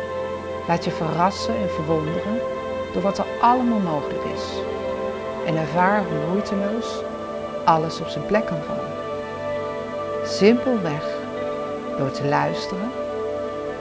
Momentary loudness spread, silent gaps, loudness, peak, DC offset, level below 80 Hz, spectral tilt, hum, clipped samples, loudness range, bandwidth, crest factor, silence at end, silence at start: 9 LU; none; -23 LUFS; -2 dBFS; under 0.1%; -48 dBFS; -6 dB/octave; none; under 0.1%; 2 LU; 8 kHz; 20 dB; 0 s; 0 s